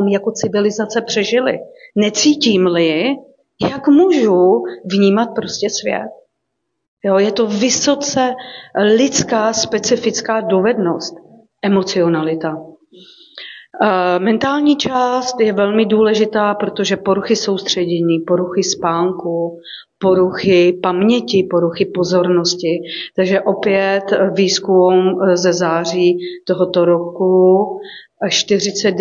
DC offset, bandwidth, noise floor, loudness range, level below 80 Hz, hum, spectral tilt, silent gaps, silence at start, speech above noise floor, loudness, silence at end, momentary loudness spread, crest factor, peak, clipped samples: under 0.1%; 7.6 kHz; -73 dBFS; 3 LU; -58 dBFS; none; -4.5 dB/octave; 6.88-6.97 s; 0 s; 59 dB; -15 LUFS; 0 s; 9 LU; 14 dB; -2 dBFS; under 0.1%